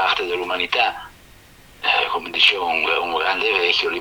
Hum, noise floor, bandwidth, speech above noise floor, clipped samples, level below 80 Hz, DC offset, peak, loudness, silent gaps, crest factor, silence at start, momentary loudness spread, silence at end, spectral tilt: none; -47 dBFS; over 20 kHz; 27 dB; under 0.1%; -54 dBFS; under 0.1%; -2 dBFS; -18 LUFS; none; 20 dB; 0 s; 7 LU; 0 s; -2 dB/octave